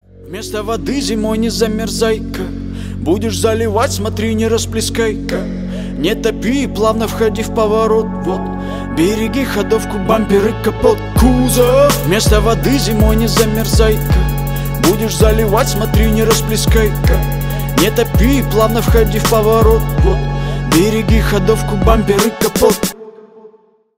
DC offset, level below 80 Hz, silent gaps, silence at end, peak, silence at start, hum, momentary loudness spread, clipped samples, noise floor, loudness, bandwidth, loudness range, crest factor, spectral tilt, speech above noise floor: under 0.1%; -20 dBFS; none; 0.5 s; 0 dBFS; 0.2 s; none; 8 LU; under 0.1%; -48 dBFS; -14 LUFS; 16.5 kHz; 4 LU; 14 dB; -5.5 dB/octave; 35 dB